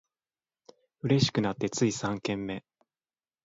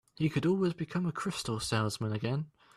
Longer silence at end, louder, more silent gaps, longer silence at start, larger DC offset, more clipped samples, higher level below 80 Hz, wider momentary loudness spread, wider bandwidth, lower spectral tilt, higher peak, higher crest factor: first, 0.85 s vs 0.3 s; first, -29 LUFS vs -33 LUFS; neither; first, 1.05 s vs 0.2 s; neither; neither; about the same, -62 dBFS vs -62 dBFS; first, 12 LU vs 6 LU; second, 8 kHz vs 13 kHz; about the same, -5 dB/octave vs -5.5 dB/octave; first, -10 dBFS vs -18 dBFS; first, 20 dB vs 14 dB